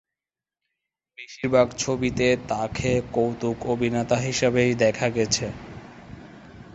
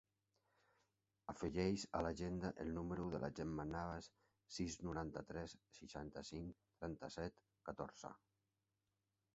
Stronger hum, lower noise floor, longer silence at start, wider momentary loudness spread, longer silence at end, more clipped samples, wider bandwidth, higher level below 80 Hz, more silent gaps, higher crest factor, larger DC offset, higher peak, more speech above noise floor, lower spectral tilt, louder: neither; about the same, under -90 dBFS vs -90 dBFS; about the same, 1.2 s vs 1.3 s; first, 21 LU vs 13 LU; second, 0.1 s vs 1.2 s; neither; about the same, 8.2 kHz vs 8 kHz; first, -48 dBFS vs -64 dBFS; neither; about the same, 20 dB vs 22 dB; neither; first, -6 dBFS vs -26 dBFS; first, over 67 dB vs 43 dB; second, -4.5 dB/octave vs -6 dB/octave; first, -23 LUFS vs -48 LUFS